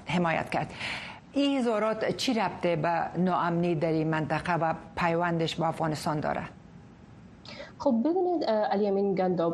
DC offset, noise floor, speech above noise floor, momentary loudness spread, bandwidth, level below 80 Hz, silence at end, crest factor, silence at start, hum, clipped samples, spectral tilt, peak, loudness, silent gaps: under 0.1%; -50 dBFS; 23 dB; 8 LU; 12 kHz; -58 dBFS; 0 s; 16 dB; 0 s; none; under 0.1%; -6 dB/octave; -12 dBFS; -28 LUFS; none